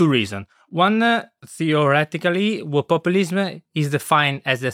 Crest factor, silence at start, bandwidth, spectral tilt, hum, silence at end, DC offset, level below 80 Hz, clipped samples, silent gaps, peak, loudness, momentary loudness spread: 16 dB; 0 s; 16 kHz; -5.5 dB/octave; none; 0 s; under 0.1%; -68 dBFS; under 0.1%; none; -4 dBFS; -20 LUFS; 9 LU